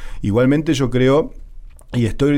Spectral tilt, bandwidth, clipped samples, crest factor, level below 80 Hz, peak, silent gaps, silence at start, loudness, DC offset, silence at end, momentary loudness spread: -7 dB/octave; 15.5 kHz; under 0.1%; 12 dB; -32 dBFS; -6 dBFS; none; 0 s; -17 LUFS; under 0.1%; 0 s; 8 LU